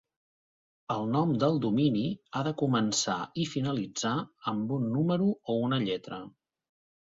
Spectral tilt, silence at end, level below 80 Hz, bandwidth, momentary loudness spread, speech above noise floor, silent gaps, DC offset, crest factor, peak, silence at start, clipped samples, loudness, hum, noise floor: -5.5 dB/octave; 0.9 s; -68 dBFS; 7.8 kHz; 7 LU; over 61 dB; none; under 0.1%; 16 dB; -14 dBFS; 0.9 s; under 0.1%; -30 LUFS; none; under -90 dBFS